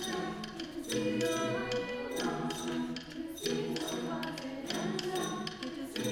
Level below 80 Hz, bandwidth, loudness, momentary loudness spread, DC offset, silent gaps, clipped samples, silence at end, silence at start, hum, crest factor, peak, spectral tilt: -62 dBFS; 19.5 kHz; -36 LUFS; 8 LU; under 0.1%; none; under 0.1%; 0 s; 0 s; none; 16 dB; -20 dBFS; -4 dB/octave